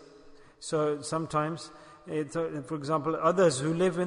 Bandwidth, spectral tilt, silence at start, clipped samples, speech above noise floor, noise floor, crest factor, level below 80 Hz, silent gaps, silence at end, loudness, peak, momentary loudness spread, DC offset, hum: 11 kHz; -5.5 dB/octave; 0 s; under 0.1%; 24 dB; -53 dBFS; 18 dB; -64 dBFS; none; 0 s; -29 LUFS; -12 dBFS; 15 LU; under 0.1%; none